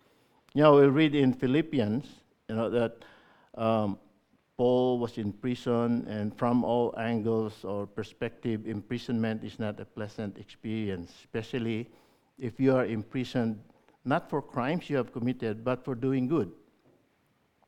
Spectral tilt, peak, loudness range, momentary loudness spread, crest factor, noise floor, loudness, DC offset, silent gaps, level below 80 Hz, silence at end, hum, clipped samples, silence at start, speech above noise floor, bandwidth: -8 dB/octave; -8 dBFS; 8 LU; 14 LU; 22 dB; -70 dBFS; -29 LUFS; under 0.1%; none; -64 dBFS; 1.15 s; none; under 0.1%; 0.55 s; 42 dB; 10.5 kHz